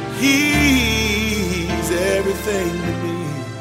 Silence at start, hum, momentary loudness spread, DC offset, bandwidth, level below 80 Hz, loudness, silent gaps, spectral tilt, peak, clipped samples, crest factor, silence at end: 0 s; none; 9 LU; under 0.1%; 16 kHz; -32 dBFS; -18 LUFS; none; -4 dB/octave; -2 dBFS; under 0.1%; 16 dB; 0 s